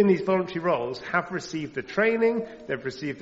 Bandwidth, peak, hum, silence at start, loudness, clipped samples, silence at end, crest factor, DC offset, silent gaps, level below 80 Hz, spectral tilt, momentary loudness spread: 8 kHz; -8 dBFS; none; 0 s; -26 LUFS; under 0.1%; 0 s; 18 dB; under 0.1%; none; -62 dBFS; -5 dB/octave; 10 LU